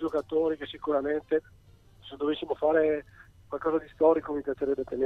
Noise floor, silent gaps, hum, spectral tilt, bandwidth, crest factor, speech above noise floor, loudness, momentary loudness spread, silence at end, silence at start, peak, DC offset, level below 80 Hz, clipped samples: -53 dBFS; none; none; -7 dB/octave; 4.7 kHz; 18 dB; 25 dB; -29 LUFS; 9 LU; 0 s; 0 s; -12 dBFS; under 0.1%; -58 dBFS; under 0.1%